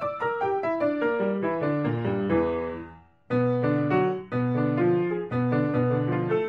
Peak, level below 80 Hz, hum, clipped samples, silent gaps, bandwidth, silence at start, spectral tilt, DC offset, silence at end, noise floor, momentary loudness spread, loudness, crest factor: -12 dBFS; -56 dBFS; none; under 0.1%; none; 5.2 kHz; 0 s; -10 dB/octave; under 0.1%; 0 s; -45 dBFS; 5 LU; -26 LUFS; 14 dB